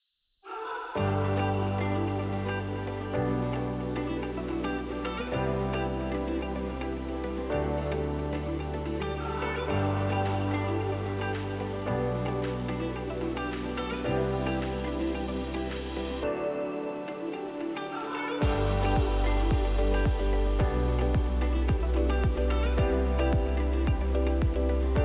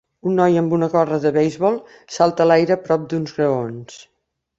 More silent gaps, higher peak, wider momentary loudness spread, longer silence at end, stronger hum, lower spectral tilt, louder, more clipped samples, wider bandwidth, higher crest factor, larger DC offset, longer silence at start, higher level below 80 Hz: neither; second, -14 dBFS vs -2 dBFS; second, 7 LU vs 11 LU; second, 0 s vs 0.6 s; neither; first, -11 dB/octave vs -7 dB/octave; second, -30 LUFS vs -18 LUFS; neither; second, 4 kHz vs 8 kHz; about the same, 14 dB vs 18 dB; neither; first, 0.45 s vs 0.25 s; first, -32 dBFS vs -60 dBFS